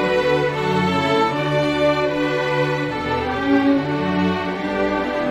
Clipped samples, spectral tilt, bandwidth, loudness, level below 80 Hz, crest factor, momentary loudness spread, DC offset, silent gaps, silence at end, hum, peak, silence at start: under 0.1%; -6.5 dB/octave; 13 kHz; -19 LUFS; -46 dBFS; 14 dB; 4 LU; under 0.1%; none; 0 s; none; -6 dBFS; 0 s